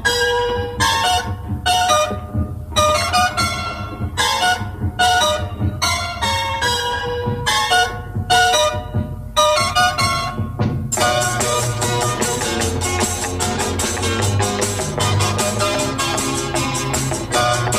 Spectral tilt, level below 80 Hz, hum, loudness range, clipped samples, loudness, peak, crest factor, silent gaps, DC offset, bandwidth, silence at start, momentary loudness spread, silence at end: -3 dB/octave; -36 dBFS; none; 2 LU; under 0.1%; -18 LUFS; -2 dBFS; 16 dB; none; under 0.1%; 15.5 kHz; 0 s; 7 LU; 0 s